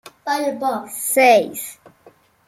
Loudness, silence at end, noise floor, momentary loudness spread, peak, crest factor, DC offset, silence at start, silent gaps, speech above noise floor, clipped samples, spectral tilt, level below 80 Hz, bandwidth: -18 LUFS; 0.75 s; -52 dBFS; 16 LU; -2 dBFS; 18 dB; under 0.1%; 0.05 s; none; 34 dB; under 0.1%; -2 dB/octave; -68 dBFS; 16.5 kHz